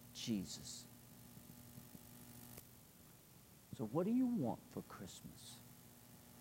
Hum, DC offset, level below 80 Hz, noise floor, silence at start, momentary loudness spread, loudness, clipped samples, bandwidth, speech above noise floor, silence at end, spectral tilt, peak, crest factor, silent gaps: none; under 0.1%; -74 dBFS; -64 dBFS; 0 s; 23 LU; -44 LUFS; under 0.1%; 16 kHz; 22 dB; 0 s; -5.5 dB/octave; -26 dBFS; 22 dB; none